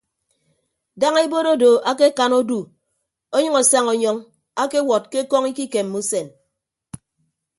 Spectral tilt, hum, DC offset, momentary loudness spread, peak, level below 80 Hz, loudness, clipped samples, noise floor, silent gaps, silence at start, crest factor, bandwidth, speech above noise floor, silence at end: -2.5 dB/octave; none; under 0.1%; 11 LU; 0 dBFS; -66 dBFS; -18 LUFS; under 0.1%; -77 dBFS; none; 0.95 s; 20 dB; 11.5 kHz; 59 dB; 1.3 s